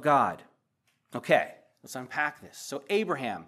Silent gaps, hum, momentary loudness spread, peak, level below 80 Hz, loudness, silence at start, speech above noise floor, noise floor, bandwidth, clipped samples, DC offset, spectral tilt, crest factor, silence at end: none; none; 16 LU; -8 dBFS; -78 dBFS; -29 LUFS; 0 s; 46 dB; -74 dBFS; 15 kHz; under 0.1%; under 0.1%; -4.5 dB/octave; 22 dB; 0.05 s